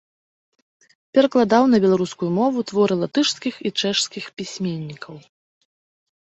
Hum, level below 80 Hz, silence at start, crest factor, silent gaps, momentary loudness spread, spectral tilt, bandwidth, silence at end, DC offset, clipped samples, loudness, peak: none; -64 dBFS; 1.15 s; 18 dB; none; 15 LU; -5 dB/octave; 8.2 kHz; 1.1 s; under 0.1%; under 0.1%; -20 LUFS; -2 dBFS